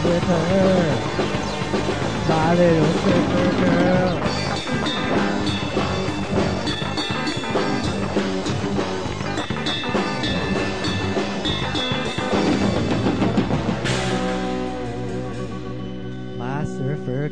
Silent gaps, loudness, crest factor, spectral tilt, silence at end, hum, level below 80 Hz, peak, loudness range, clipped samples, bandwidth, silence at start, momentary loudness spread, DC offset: none; -22 LUFS; 16 dB; -5.5 dB/octave; 0 s; none; -40 dBFS; -6 dBFS; 4 LU; under 0.1%; 10.5 kHz; 0 s; 9 LU; 2%